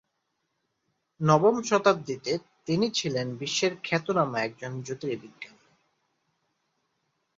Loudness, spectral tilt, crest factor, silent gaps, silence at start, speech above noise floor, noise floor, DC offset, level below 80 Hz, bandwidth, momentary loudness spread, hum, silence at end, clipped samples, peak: -27 LUFS; -5 dB/octave; 22 dB; none; 1.2 s; 52 dB; -78 dBFS; under 0.1%; -70 dBFS; 7.8 kHz; 14 LU; none; 1.9 s; under 0.1%; -6 dBFS